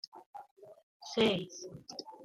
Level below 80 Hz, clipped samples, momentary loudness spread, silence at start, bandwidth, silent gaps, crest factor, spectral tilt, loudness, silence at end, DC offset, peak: -72 dBFS; under 0.1%; 22 LU; 0.15 s; 13.5 kHz; 0.26-0.34 s, 0.51-0.57 s, 0.83-1.00 s; 22 dB; -4.5 dB/octave; -34 LUFS; 0 s; under 0.1%; -16 dBFS